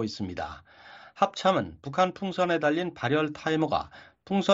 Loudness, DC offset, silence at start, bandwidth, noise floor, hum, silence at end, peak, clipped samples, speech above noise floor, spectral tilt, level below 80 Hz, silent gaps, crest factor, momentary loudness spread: -28 LUFS; under 0.1%; 0 s; 7.8 kHz; -50 dBFS; none; 0 s; -8 dBFS; under 0.1%; 23 dB; -4 dB/octave; -60 dBFS; none; 20 dB; 14 LU